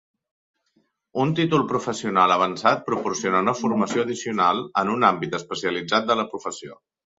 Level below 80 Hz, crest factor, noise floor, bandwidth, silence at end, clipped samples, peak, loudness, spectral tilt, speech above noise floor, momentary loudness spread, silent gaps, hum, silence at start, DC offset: -64 dBFS; 22 dB; -68 dBFS; 8 kHz; 0.45 s; under 0.1%; -2 dBFS; -22 LUFS; -5 dB/octave; 46 dB; 9 LU; none; none; 1.15 s; under 0.1%